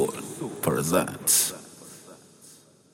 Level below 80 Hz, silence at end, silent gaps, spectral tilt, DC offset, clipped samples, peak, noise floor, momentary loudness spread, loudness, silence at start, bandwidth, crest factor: -62 dBFS; 0.4 s; none; -3 dB/octave; under 0.1%; under 0.1%; -6 dBFS; -53 dBFS; 24 LU; -24 LUFS; 0 s; 16.5 kHz; 22 dB